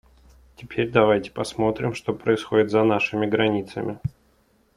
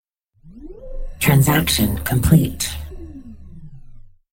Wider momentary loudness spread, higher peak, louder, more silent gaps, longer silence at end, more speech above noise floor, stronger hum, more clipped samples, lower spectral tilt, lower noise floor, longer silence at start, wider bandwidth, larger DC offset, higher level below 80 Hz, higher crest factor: second, 11 LU vs 23 LU; second, -4 dBFS vs 0 dBFS; second, -23 LUFS vs -17 LUFS; neither; first, 0.65 s vs 0.35 s; first, 40 dB vs 32 dB; neither; neither; first, -6.5 dB/octave vs -5 dB/octave; first, -62 dBFS vs -48 dBFS; first, 0.6 s vs 0.45 s; second, 11.5 kHz vs 17 kHz; neither; second, -52 dBFS vs -32 dBFS; about the same, 20 dB vs 20 dB